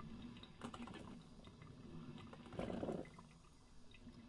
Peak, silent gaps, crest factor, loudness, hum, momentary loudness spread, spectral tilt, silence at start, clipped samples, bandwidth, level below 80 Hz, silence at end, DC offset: -32 dBFS; none; 22 dB; -53 LUFS; none; 18 LU; -6.5 dB/octave; 0 s; under 0.1%; 11 kHz; -66 dBFS; 0 s; under 0.1%